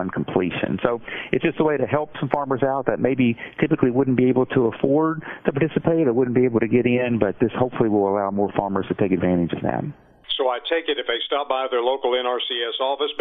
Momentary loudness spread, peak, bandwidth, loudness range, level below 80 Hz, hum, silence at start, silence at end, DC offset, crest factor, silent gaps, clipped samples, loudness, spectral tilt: 5 LU; -2 dBFS; 4 kHz; 3 LU; -54 dBFS; none; 0 s; 0 s; under 0.1%; 20 dB; none; under 0.1%; -22 LUFS; -10 dB/octave